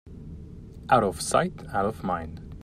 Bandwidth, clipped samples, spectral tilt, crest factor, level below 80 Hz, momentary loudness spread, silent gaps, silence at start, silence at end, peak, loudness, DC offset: 15 kHz; under 0.1%; -5 dB/octave; 22 dB; -46 dBFS; 21 LU; none; 0.05 s; 0 s; -6 dBFS; -26 LUFS; under 0.1%